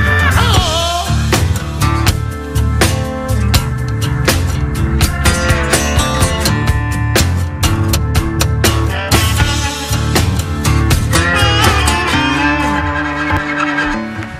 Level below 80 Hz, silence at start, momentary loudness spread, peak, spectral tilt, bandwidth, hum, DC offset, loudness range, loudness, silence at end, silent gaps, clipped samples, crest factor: -20 dBFS; 0 s; 6 LU; 0 dBFS; -4.5 dB/octave; 16 kHz; none; under 0.1%; 2 LU; -14 LUFS; 0 s; none; under 0.1%; 14 dB